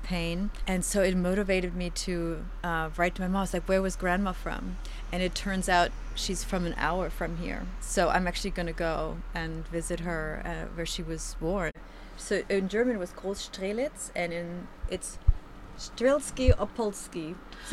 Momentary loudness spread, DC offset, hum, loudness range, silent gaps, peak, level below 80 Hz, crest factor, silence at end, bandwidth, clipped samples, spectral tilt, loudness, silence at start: 11 LU; under 0.1%; none; 4 LU; none; -8 dBFS; -36 dBFS; 20 dB; 0 s; 15 kHz; under 0.1%; -4.5 dB/octave; -31 LUFS; 0 s